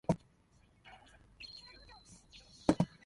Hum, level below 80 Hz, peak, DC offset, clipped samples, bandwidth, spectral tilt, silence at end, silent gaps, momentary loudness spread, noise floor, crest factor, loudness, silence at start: none; -60 dBFS; -10 dBFS; under 0.1%; under 0.1%; 11.5 kHz; -6.5 dB/octave; 0.2 s; none; 25 LU; -68 dBFS; 30 dB; -37 LUFS; 0.1 s